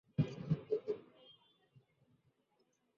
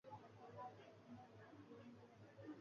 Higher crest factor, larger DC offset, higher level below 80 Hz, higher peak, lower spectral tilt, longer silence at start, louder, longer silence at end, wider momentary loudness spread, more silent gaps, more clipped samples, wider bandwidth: first, 22 dB vs 16 dB; neither; first, -70 dBFS vs -86 dBFS; first, -22 dBFS vs -44 dBFS; first, -9 dB/octave vs -6 dB/octave; first, 0.2 s vs 0.05 s; first, -40 LUFS vs -61 LUFS; first, 1.65 s vs 0 s; about the same, 8 LU vs 6 LU; neither; neither; about the same, 6.8 kHz vs 7 kHz